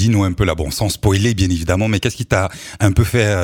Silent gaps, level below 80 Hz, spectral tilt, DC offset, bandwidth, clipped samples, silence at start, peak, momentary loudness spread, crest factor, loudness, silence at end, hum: none; -30 dBFS; -5.5 dB/octave; under 0.1%; 17.5 kHz; under 0.1%; 0 s; 0 dBFS; 4 LU; 16 dB; -17 LUFS; 0 s; none